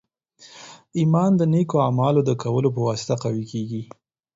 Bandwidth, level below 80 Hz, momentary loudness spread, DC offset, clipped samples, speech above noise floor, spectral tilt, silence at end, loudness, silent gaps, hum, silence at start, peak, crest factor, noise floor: 7.8 kHz; -60 dBFS; 19 LU; under 0.1%; under 0.1%; 32 dB; -7.5 dB/octave; 0.5 s; -21 LUFS; none; none; 0.4 s; -6 dBFS; 16 dB; -52 dBFS